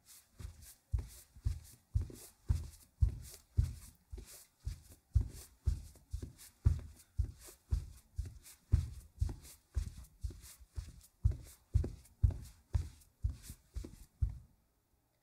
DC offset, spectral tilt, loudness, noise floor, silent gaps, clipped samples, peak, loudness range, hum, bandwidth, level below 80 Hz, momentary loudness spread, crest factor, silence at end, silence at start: under 0.1%; -6.5 dB/octave; -42 LUFS; -77 dBFS; none; under 0.1%; -16 dBFS; 2 LU; none; 16 kHz; -42 dBFS; 17 LU; 24 dB; 0.8 s; 0.1 s